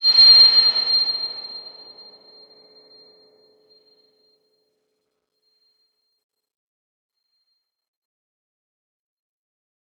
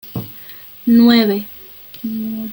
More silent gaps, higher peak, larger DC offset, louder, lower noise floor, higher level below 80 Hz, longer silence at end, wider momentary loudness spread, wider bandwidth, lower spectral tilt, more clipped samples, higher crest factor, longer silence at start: neither; about the same, -2 dBFS vs 0 dBFS; neither; first, -11 LUFS vs -15 LUFS; first, -75 dBFS vs -37 dBFS; second, -88 dBFS vs -54 dBFS; first, 8.4 s vs 0 s; about the same, 25 LU vs 23 LU; second, 7.6 kHz vs 17 kHz; second, 1 dB/octave vs -7 dB/octave; neither; about the same, 20 dB vs 16 dB; about the same, 0 s vs 0.05 s